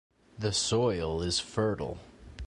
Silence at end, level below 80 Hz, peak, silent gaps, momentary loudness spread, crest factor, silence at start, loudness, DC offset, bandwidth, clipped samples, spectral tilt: 0 s; -48 dBFS; -14 dBFS; none; 13 LU; 18 dB; 0.35 s; -30 LUFS; under 0.1%; 11.5 kHz; under 0.1%; -4 dB/octave